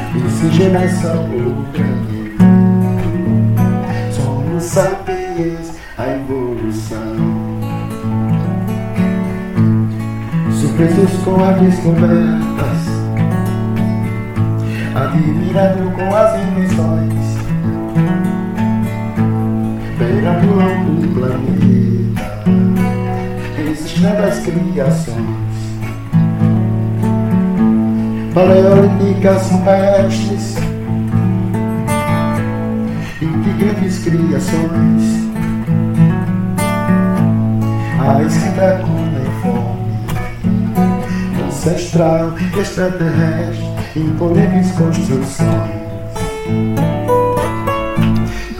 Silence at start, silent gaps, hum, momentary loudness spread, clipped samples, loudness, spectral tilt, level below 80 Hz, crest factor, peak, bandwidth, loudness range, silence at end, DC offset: 0 s; none; none; 8 LU; under 0.1%; -15 LUFS; -7.5 dB/octave; -32 dBFS; 14 dB; 0 dBFS; 16 kHz; 5 LU; 0 s; under 0.1%